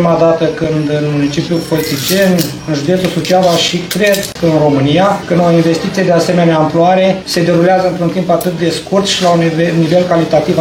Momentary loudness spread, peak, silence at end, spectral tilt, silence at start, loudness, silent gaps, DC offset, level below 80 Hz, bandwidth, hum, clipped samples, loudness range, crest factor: 5 LU; 0 dBFS; 0 s; -5.5 dB/octave; 0 s; -11 LUFS; none; under 0.1%; -44 dBFS; 18 kHz; none; under 0.1%; 2 LU; 10 dB